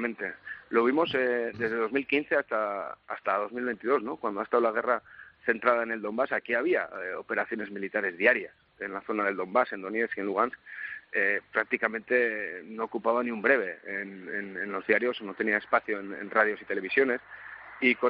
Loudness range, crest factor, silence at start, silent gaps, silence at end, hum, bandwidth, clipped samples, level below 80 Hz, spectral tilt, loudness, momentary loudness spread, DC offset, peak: 1 LU; 22 dB; 0 s; none; 0 s; none; 5.4 kHz; under 0.1%; -74 dBFS; -2.5 dB/octave; -29 LUFS; 11 LU; under 0.1%; -6 dBFS